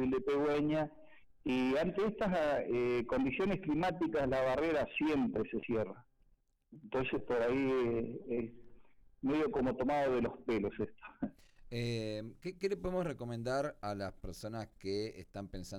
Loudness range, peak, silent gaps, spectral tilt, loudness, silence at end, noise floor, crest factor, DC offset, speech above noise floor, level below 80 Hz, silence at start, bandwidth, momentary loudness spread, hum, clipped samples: 6 LU; -24 dBFS; none; -7 dB/octave; -36 LUFS; 0 s; -71 dBFS; 12 dB; under 0.1%; 36 dB; -58 dBFS; 0 s; 13 kHz; 11 LU; none; under 0.1%